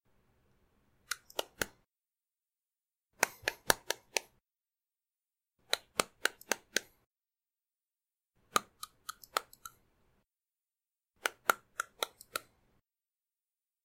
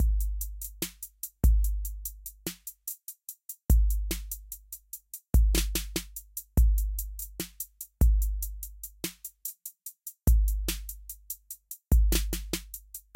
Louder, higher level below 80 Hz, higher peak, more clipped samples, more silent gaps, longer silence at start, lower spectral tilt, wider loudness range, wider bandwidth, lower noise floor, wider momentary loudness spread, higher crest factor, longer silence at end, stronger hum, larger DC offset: second, -36 LUFS vs -31 LUFS; second, -70 dBFS vs -30 dBFS; first, -2 dBFS vs -10 dBFS; neither; first, 7.06-7.15 s vs none; first, 1.1 s vs 0 s; second, -0.5 dB/octave vs -4.5 dB/octave; about the same, 5 LU vs 3 LU; about the same, 16 kHz vs 17 kHz; first, under -90 dBFS vs -46 dBFS; second, 12 LU vs 16 LU; first, 40 dB vs 18 dB; first, 1.45 s vs 0.15 s; neither; neither